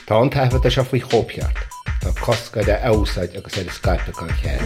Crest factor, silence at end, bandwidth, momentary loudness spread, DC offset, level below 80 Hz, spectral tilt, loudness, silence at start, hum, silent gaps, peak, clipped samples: 16 dB; 0 s; 16 kHz; 9 LU; under 0.1%; -26 dBFS; -6 dB/octave; -20 LUFS; 0 s; none; none; -2 dBFS; under 0.1%